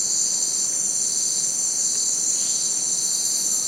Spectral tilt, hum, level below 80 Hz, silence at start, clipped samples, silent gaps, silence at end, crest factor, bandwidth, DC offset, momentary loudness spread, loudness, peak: 1.5 dB/octave; none; -74 dBFS; 0 s; under 0.1%; none; 0 s; 12 dB; 16 kHz; under 0.1%; 1 LU; -19 LUFS; -10 dBFS